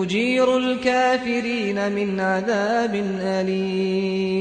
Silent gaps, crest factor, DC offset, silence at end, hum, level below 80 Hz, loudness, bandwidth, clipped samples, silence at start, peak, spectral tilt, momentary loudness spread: none; 14 dB; under 0.1%; 0 s; none; -56 dBFS; -21 LUFS; 9.4 kHz; under 0.1%; 0 s; -8 dBFS; -5.5 dB/octave; 5 LU